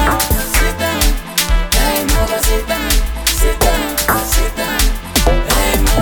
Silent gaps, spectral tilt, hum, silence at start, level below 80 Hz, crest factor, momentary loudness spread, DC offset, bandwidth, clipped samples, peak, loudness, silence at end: none; -3 dB/octave; none; 0 s; -16 dBFS; 14 dB; 3 LU; under 0.1%; 19.5 kHz; under 0.1%; 0 dBFS; -15 LUFS; 0 s